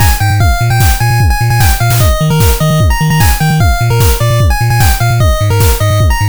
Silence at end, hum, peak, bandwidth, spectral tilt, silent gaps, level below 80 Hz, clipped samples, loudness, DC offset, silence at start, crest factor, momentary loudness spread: 0 s; none; 0 dBFS; over 20 kHz; -5 dB/octave; none; -14 dBFS; 0.3%; -10 LUFS; 6%; 0 s; 8 dB; 1 LU